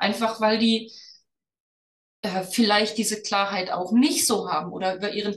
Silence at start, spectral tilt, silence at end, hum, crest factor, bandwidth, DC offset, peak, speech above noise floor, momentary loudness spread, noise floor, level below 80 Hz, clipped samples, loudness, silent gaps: 0 s; -3 dB/octave; 0 s; none; 18 dB; 12.5 kHz; under 0.1%; -6 dBFS; 34 dB; 8 LU; -57 dBFS; -72 dBFS; under 0.1%; -23 LUFS; 1.60-2.23 s